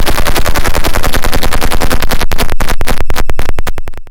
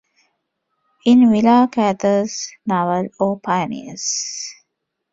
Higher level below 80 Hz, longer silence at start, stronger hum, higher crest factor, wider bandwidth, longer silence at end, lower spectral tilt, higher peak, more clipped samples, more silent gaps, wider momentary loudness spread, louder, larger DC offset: first, -12 dBFS vs -60 dBFS; second, 0 s vs 1.05 s; neither; second, 6 dB vs 16 dB; first, 17 kHz vs 7.8 kHz; second, 0 s vs 0.6 s; about the same, -4 dB/octave vs -4.5 dB/octave; about the same, 0 dBFS vs -2 dBFS; neither; neither; second, 6 LU vs 14 LU; about the same, -15 LUFS vs -17 LUFS; first, 20% vs under 0.1%